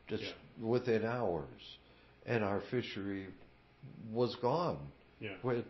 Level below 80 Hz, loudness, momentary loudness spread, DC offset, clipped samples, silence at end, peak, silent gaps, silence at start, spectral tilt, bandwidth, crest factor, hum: -64 dBFS; -37 LUFS; 19 LU; under 0.1%; under 0.1%; 0 s; -20 dBFS; none; 0.05 s; -5 dB/octave; 6 kHz; 18 dB; none